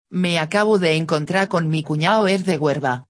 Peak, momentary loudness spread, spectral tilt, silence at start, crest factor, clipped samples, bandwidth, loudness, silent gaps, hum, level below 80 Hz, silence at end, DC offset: -4 dBFS; 4 LU; -5.5 dB/octave; 0.1 s; 16 dB; under 0.1%; 11 kHz; -19 LUFS; none; none; -62 dBFS; 0.05 s; under 0.1%